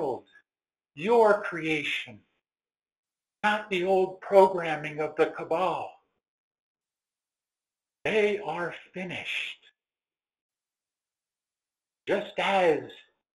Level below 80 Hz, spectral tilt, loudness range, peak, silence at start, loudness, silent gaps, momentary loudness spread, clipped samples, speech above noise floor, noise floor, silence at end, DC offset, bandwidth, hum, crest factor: -72 dBFS; -5 dB/octave; 10 LU; -6 dBFS; 0 s; -27 LUFS; 2.99-3.04 s, 6.28-6.51 s, 6.59-6.75 s, 10.41-10.49 s; 15 LU; under 0.1%; over 64 dB; under -90 dBFS; 0.35 s; under 0.1%; 13 kHz; none; 24 dB